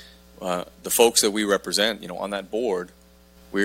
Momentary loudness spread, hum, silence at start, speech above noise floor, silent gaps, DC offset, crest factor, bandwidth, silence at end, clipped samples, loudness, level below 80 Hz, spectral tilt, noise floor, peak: 14 LU; none; 0 s; 29 dB; none; under 0.1%; 24 dB; 16.5 kHz; 0 s; under 0.1%; -23 LUFS; -56 dBFS; -2 dB/octave; -52 dBFS; 0 dBFS